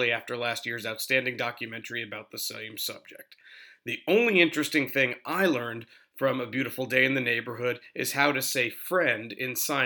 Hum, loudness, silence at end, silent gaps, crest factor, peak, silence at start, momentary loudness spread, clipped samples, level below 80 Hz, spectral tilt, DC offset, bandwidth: none; -27 LUFS; 0 s; none; 22 dB; -6 dBFS; 0 s; 11 LU; under 0.1%; -84 dBFS; -3.5 dB/octave; under 0.1%; over 20 kHz